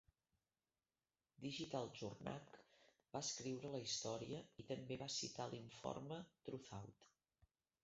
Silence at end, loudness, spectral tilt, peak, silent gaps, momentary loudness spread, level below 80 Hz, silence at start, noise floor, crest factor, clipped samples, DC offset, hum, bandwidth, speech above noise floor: 0.4 s; -50 LUFS; -4 dB/octave; -30 dBFS; none; 10 LU; -80 dBFS; 1.4 s; under -90 dBFS; 22 dB; under 0.1%; under 0.1%; none; 7.6 kHz; over 40 dB